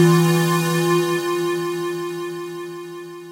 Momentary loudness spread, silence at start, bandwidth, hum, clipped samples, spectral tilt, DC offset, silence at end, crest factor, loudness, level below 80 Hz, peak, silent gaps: 16 LU; 0 s; 16 kHz; none; under 0.1%; -5.5 dB/octave; under 0.1%; 0 s; 16 dB; -20 LUFS; -76 dBFS; -4 dBFS; none